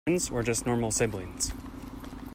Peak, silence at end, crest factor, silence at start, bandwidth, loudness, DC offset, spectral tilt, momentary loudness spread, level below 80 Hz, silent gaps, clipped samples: -14 dBFS; 0 s; 16 dB; 0.05 s; 16 kHz; -29 LUFS; under 0.1%; -4 dB/octave; 15 LU; -46 dBFS; none; under 0.1%